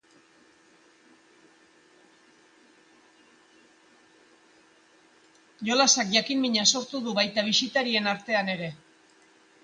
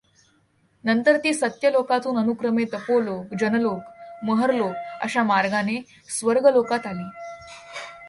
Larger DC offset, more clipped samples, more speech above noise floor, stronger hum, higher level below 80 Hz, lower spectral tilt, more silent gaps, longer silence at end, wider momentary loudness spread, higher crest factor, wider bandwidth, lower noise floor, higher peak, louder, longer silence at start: neither; neither; second, 34 dB vs 41 dB; neither; second, -76 dBFS vs -66 dBFS; second, -2 dB/octave vs -4.5 dB/octave; neither; first, 0.85 s vs 0 s; second, 11 LU vs 17 LU; first, 24 dB vs 18 dB; about the same, 10.5 kHz vs 11.5 kHz; about the same, -60 dBFS vs -63 dBFS; about the same, -6 dBFS vs -4 dBFS; about the same, -24 LUFS vs -22 LUFS; first, 5.6 s vs 0.85 s